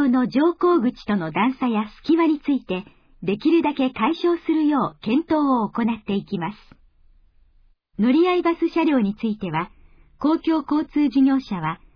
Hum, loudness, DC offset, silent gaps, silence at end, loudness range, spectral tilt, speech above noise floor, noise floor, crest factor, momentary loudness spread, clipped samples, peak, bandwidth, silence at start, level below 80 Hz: none; -21 LUFS; under 0.1%; none; 0.2 s; 2 LU; -8.5 dB/octave; 36 dB; -57 dBFS; 14 dB; 9 LU; under 0.1%; -8 dBFS; 5.4 kHz; 0 s; -54 dBFS